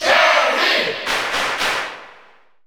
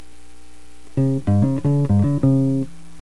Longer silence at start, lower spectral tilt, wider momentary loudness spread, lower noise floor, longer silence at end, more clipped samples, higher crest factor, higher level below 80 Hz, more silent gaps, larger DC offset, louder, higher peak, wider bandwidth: second, 0 s vs 0.95 s; second, -0.5 dB/octave vs -10 dB/octave; first, 12 LU vs 8 LU; about the same, -50 dBFS vs -48 dBFS; first, 0.55 s vs 0.35 s; neither; about the same, 18 dB vs 14 dB; second, -56 dBFS vs -44 dBFS; neither; second, under 0.1% vs 3%; first, -16 LUFS vs -19 LUFS; about the same, -2 dBFS vs -4 dBFS; first, over 20 kHz vs 11 kHz